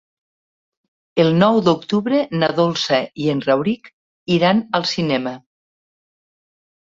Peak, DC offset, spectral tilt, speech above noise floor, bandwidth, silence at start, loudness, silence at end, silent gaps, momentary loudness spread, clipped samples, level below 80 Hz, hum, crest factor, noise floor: -2 dBFS; under 0.1%; -6 dB/octave; over 73 dB; 7.8 kHz; 1.15 s; -18 LUFS; 1.45 s; 3.93-4.26 s; 10 LU; under 0.1%; -58 dBFS; none; 18 dB; under -90 dBFS